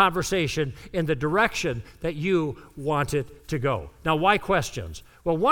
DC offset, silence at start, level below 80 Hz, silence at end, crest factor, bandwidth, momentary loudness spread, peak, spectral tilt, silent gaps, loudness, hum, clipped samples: under 0.1%; 0 s; -46 dBFS; 0 s; 20 dB; 18.5 kHz; 11 LU; -6 dBFS; -5 dB/octave; none; -26 LUFS; none; under 0.1%